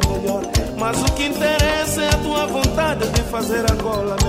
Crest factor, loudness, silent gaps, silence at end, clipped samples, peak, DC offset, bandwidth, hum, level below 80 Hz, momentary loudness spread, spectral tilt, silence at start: 16 dB; -19 LUFS; none; 0 s; under 0.1%; -2 dBFS; under 0.1%; 16 kHz; none; -26 dBFS; 4 LU; -4.5 dB/octave; 0 s